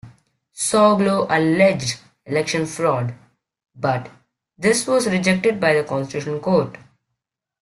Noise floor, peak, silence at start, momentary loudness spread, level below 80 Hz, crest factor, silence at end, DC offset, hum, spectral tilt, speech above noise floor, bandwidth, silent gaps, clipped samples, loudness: -81 dBFS; -2 dBFS; 0.05 s; 10 LU; -58 dBFS; 18 dB; 0.85 s; under 0.1%; none; -4.5 dB/octave; 62 dB; 12.5 kHz; none; under 0.1%; -19 LUFS